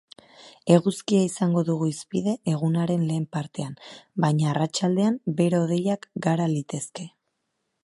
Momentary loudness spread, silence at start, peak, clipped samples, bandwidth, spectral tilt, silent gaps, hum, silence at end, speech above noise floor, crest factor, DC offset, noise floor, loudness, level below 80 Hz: 13 LU; 0.4 s; -4 dBFS; under 0.1%; 11.5 kHz; -6.5 dB/octave; none; none; 0.75 s; 53 dB; 22 dB; under 0.1%; -77 dBFS; -24 LUFS; -68 dBFS